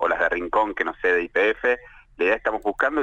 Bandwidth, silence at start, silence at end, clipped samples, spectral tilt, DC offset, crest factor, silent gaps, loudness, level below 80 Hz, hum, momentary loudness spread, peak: 8.2 kHz; 0 s; 0 s; under 0.1%; -4.5 dB/octave; under 0.1%; 16 dB; none; -22 LUFS; -50 dBFS; none; 4 LU; -8 dBFS